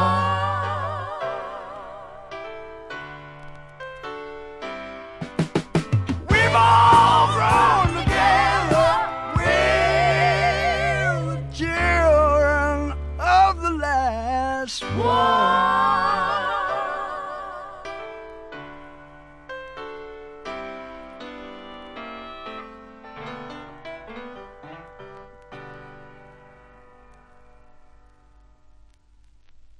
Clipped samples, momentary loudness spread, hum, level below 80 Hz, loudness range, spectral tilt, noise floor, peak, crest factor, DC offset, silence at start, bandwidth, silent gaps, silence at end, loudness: under 0.1%; 22 LU; none; -38 dBFS; 21 LU; -5 dB/octave; -53 dBFS; -4 dBFS; 20 dB; under 0.1%; 0 s; 12 kHz; none; 0.25 s; -20 LUFS